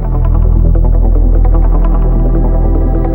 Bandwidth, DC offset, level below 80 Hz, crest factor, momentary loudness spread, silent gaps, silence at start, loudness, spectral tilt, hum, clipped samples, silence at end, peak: 2.1 kHz; under 0.1%; -8 dBFS; 8 dB; 2 LU; none; 0 s; -12 LUFS; -12.5 dB/octave; none; under 0.1%; 0 s; 0 dBFS